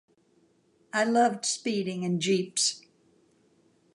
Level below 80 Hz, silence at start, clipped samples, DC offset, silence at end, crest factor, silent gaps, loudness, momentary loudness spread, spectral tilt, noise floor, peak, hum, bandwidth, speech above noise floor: -80 dBFS; 0.95 s; under 0.1%; under 0.1%; 1.15 s; 18 dB; none; -27 LUFS; 6 LU; -3.5 dB/octave; -66 dBFS; -12 dBFS; none; 11.5 kHz; 39 dB